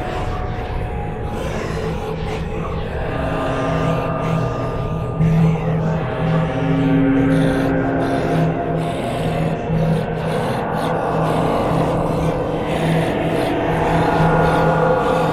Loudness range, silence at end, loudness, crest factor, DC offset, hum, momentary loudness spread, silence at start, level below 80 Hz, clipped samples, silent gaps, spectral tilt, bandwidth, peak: 5 LU; 0 s; -19 LUFS; 14 dB; 0.1%; none; 9 LU; 0 s; -32 dBFS; under 0.1%; none; -7.5 dB/octave; 12.5 kHz; -4 dBFS